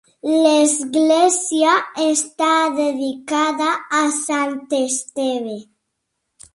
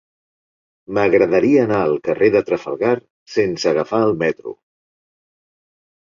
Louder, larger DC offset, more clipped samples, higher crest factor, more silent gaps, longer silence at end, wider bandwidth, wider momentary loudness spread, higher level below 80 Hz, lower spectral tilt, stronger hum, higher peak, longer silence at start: about the same, -18 LUFS vs -17 LUFS; neither; neither; about the same, 16 dB vs 16 dB; second, none vs 3.10-3.26 s; second, 0.95 s vs 1.6 s; first, 11.5 kHz vs 7.4 kHz; about the same, 8 LU vs 10 LU; second, -70 dBFS vs -56 dBFS; second, -1.5 dB/octave vs -6.5 dB/octave; neither; about the same, -2 dBFS vs -2 dBFS; second, 0.25 s vs 0.9 s